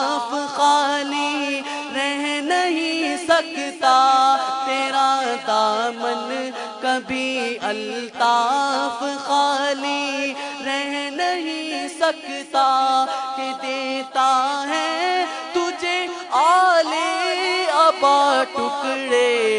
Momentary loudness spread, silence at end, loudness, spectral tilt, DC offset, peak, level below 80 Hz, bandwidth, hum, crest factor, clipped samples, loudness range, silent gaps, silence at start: 9 LU; 0 s; -20 LUFS; -1.5 dB/octave; under 0.1%; -2 dBFS; -70 dBFS; 11 kHz; none; 18 dB; under 0.1%; 4 LU; none; 0 s